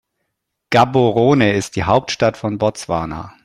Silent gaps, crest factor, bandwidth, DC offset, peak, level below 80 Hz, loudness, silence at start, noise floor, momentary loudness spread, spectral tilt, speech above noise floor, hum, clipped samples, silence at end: none; 16 dB; 13.5 kHz; under 0.1%; 0 dBFS; -46 dBFS; -16 LUFS; 0.7 s; -74 dBFS; 9 LU; -6 dB/octave; 59 dB; none; under 0.1%; 0.15 s